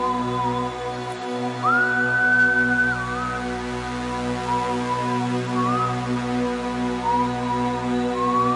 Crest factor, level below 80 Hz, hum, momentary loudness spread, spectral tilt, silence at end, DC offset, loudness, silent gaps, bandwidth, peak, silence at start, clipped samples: 12 dB; -46 dBFS; 60 Hz at -55 dBFS; 10 LU; -5.5 dB/octave; 0 s; under 0.1%; -22 LUFS; none; 11.5 kHz; -12 dBFS; 0 s; under 0.1%